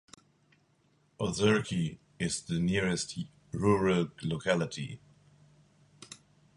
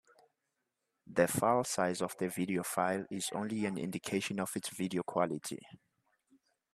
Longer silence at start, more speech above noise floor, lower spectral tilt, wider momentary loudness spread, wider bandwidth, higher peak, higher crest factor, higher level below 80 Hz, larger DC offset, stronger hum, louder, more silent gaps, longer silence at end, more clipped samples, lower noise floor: about the same, 1.2 s vs 1.1 s; second, 39 dB vs 51 dB; about the same, -5 dB/octave vs -4.5 dB/octave; first, 20 LU vs 7 LU; second, 11.5 kHz vs 15.5 kHz; about the same, -12 dBFS vs -12 dBFS; about the same, 20 dB vs 24 dB; first, -56 dBFS vs -74 dBFS; neither; neither; first, -31 LUFS vs -35 LUFS; neither; second, 0.4 s vs 1 s; neither; second, -69 dBFS vs -85 dBFS